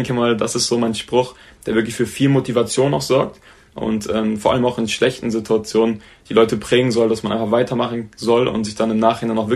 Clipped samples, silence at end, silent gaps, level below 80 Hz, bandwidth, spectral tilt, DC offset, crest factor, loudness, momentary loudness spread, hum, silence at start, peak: under 0.1%; 0 s; none; -48 dBFS; 13.5 kHz; -5 dB/octave; under 0.1%; 18 dB; -18 LUFS; 7 LU; none; 0 s; 0 dBFS